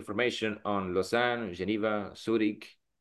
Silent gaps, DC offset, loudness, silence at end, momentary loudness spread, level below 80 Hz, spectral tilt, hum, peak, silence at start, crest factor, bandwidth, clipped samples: none; under 0.1%; -31 LUFS; 0.3 s; 6 LU; -60 dBFS; -5.5 dB/octave; none; -12 dBFS; 0 s; 18 dB; 12.5 kHz; under 0.1%